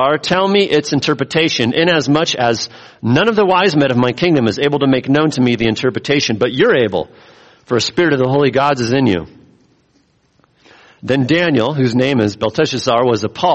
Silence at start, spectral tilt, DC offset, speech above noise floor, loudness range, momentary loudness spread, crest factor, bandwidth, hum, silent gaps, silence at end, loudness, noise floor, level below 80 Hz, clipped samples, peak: 0 s; -5.5 dB/octave; under 0.1%; 43 dB; 4 LU; 5 LU; 14 dB; 8.4 kHz; none; none; 0 s; -14 LUFS; -57 dBFS; -50 dBFS; under 0.1%; -2 dBFS